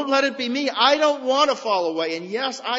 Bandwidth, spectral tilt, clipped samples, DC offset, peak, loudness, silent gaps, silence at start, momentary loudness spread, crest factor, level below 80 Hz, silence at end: 8 kHz; -2.5 dB/octave; under 0.1%; under 0.1%; -2 dBFS; -21 LUFS; none; 0 s; 9 LU; 18 dB; -74 dBFS; 0 s